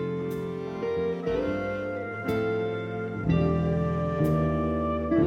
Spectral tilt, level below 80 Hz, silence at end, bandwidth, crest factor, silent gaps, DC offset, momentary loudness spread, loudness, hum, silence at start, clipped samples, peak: -9 dB/octave; -44 dBFS; 0 s; 15.5 kHz; 14 dB; none; under 0.1%; 7 LU; -28 LUFS; none; 0 s; under 0.1%; -12 dBFS